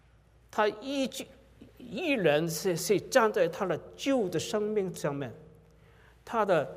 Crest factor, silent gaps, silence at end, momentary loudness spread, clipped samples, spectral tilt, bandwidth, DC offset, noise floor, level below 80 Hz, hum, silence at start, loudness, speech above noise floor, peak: 20 dB; none; 0 s; 11 LU; under 0.1%; -4.5 dB/octave; 16 kHz; under 0.1%; -61 dBFS; -64 dBFS; none; 0.55 s; -30 LUFS; 31 dB; -10 dBFS